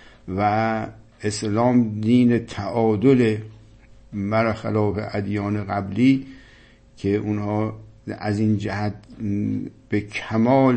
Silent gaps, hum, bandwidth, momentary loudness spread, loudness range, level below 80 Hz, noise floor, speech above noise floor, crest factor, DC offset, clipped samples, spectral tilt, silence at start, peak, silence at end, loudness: none; none; 8.8 kHz; 13 LU; 5 LU; -52 dBFS; -50 dBFS; 29 dB; 18 dB; under 0.1%; under 0.1%; -7.5 dB/octave; 0.25 s; -4 dBFS; 0 s; -22 LUFS